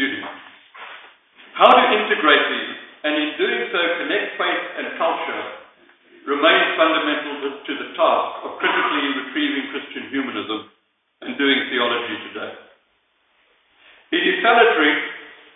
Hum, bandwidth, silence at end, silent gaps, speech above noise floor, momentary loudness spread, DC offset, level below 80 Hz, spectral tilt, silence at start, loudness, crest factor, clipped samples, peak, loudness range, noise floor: none; 4.1 kHz; 0.2 s; none; 45 dB; 18 LU; under 0.1%; -74 dBFS; -5.5 dB/octave; 0 s; -19 LUFS; 20 dB; under 0.1%; 0 dBFS; 6 LU; -64 dBFS